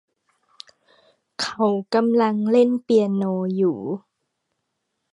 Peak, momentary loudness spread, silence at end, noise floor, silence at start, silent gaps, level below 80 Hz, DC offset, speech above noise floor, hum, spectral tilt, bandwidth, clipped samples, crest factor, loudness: -6 dBFS; 11 LU; 1.15 s; -77 dBFS; 1.4 s; none; -72 dBFS; under 0.1%; 57 dB; none; -6.5 dB/octave; 11.5 kHz; under 0.1%; 16 dB; -21 LUFS